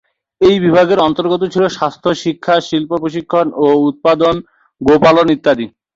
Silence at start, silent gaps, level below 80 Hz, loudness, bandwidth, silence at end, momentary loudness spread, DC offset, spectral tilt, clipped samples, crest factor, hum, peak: 0.4 s; none; -46 dBFS; -13 LUFS; 7.8 kHz; 0.3 s; 8 LU; under 0.1%; -6 dB/octave; under 0.1%; 12 dB; none; 0 dBFS